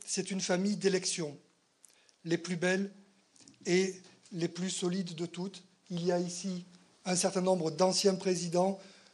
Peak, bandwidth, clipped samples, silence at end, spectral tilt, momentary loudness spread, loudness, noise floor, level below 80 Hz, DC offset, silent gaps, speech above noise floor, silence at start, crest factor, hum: -14 dBFS; 11.5 kHz; under 0.1%; 0.2 s; -4 dB/octave; 14 LU; -33 LUFS; -65 dBFS; -82 dBFS; under 0.1%; none; 33 dB; 0 s; 20 dB; none